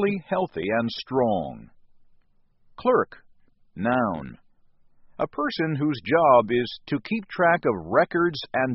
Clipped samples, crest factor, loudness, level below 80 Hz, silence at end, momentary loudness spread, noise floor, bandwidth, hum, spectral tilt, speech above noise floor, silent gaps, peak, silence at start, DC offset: under 0.1%; 20 dB; -24 LUFS; -58 dBFS; 0 s; 11 LU; -60 dBFS; 6 kHz; none; -4.5 dB/octave; 36 dB; none; -4 dBFS; 0 s; under 0.1%